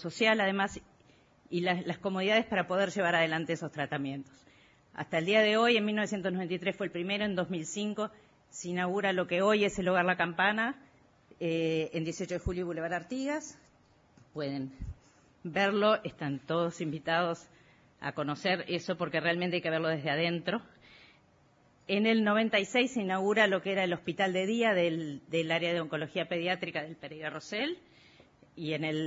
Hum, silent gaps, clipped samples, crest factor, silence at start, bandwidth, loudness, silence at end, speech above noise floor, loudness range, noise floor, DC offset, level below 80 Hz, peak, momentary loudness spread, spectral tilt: none; none; under 0.1%; 20 dB; 0 s; 7.4 kHz; -31 LUFS; 0 s; 34 dB; 6 LU; -65 dBFS; under 0.1%; -60 dBFS; -12 dBFS; 13 LU; -3 dB/octave